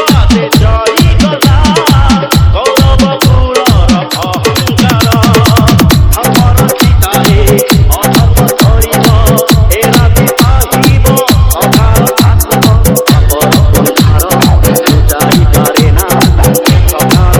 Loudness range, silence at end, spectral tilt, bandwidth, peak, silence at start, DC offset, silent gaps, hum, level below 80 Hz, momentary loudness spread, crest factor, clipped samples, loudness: 1 LU; 0 s; -5 dB/octave; over 20 kHz; 0 dBFS; 0 s; under 0.1%; none; none; -12 dBFS; 2 LU; 6 dB; 8%; -7 LUFS